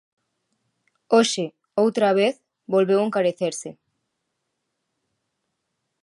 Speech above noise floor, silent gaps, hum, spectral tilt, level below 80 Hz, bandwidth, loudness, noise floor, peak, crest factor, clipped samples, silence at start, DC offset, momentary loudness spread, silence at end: 58 dB; none; none; -4.5 dB/octave; -80 dBFS; 11.5 kHz; -21 LUFS; -78 dBFS; -6 dBFS; 18 dB; under 0.1%; 1.1 s; under 0.1%; 10 LU; 2.3 s